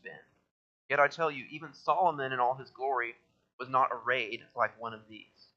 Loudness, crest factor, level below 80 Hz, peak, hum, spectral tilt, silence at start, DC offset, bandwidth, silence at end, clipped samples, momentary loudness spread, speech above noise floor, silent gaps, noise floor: -31 LUFS; 22 dB; -84 dBFS; -12 dBFS; none; -5 dB/octave; 0.05 s; under 0.1%; 7.4 kHz; 0.35 s; under 0.1%; 17 LU; 19 dB; 0.51-0.89 s, 3.53-3.58 s; -51 dBFS